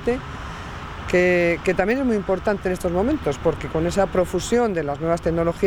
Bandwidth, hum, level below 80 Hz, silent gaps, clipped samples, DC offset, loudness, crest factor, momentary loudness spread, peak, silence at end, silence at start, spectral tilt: 17.5 kHz; none; -38 dBFS; none; under 0.1%; under 0.1%; -21 LUFS; 16 dB; 13 LU; -6 dBFS; 0 s; 0 s; -6 dB/octave